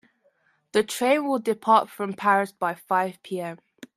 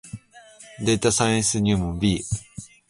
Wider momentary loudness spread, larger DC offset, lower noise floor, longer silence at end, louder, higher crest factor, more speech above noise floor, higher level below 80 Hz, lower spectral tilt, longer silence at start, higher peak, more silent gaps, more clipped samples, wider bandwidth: second, 12 LU vs 20 LU; neither; first, -66 dBFS vs -48 dBFS; first, 0.4 s vs 0.25 s; about the same, -24 LUFS vs -22 LUFS; about the same, 20 dB vs 18 dB; first, 42 dB vs 27 dB; second, -72 dBFS vs -42 dBFS; about the same, -4.5 dB/octave vs -4.5 dB/octave; first, 0.75 s vs 0.05 s; about the same, -6 dBFS vs -6 dBFS; neither; neither; first, 15.5 kHz vs 11.5 kHz